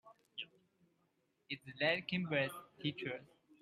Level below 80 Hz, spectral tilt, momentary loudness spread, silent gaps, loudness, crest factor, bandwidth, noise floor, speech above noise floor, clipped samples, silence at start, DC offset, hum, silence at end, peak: -80 dBFS; -5.5 dB/octave; 14 LU; none; -40 LUFS; 22 dB; 14.5 kHz; -80 dBFS; 40 dB; under 0.1%; 0.05 s; under 0.1%; none; 0.35 s; -20 dBFS